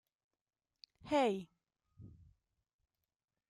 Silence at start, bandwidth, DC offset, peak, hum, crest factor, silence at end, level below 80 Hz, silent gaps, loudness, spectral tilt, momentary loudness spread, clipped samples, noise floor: 1.05 s; 11 kHz; under 0.1%; -22 dBFS; none; 22 dB; 1.4 s; -74 dBFS; none; -36 LUFS; -5.5 dB/octave; 26 LU; under 0.1%; under -90 dBFS